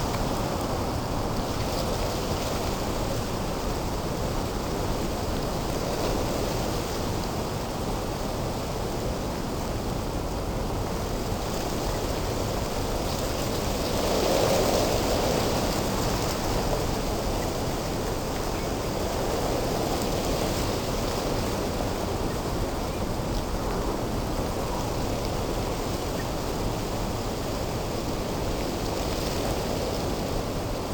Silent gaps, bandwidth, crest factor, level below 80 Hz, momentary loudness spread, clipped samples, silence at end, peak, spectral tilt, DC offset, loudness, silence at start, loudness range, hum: none; over 20 kHz; 16 dB; -34 dBFS; 4 LU; under 0.1%; 0 s; -10 dBFS; -5 dB/octave; under 0.1%; -28 LUFS; 0 s; 5 LU; none